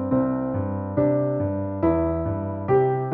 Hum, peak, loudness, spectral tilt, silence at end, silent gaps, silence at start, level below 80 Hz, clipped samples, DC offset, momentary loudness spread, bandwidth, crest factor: none; -10 dBFS; -24 LUFS; -10.5 dB/octave; 0 s; none; 0 s; -46 dBFS; under 0.1%; under 0.1%; 6 LU; 3.6 kHz; 14 dB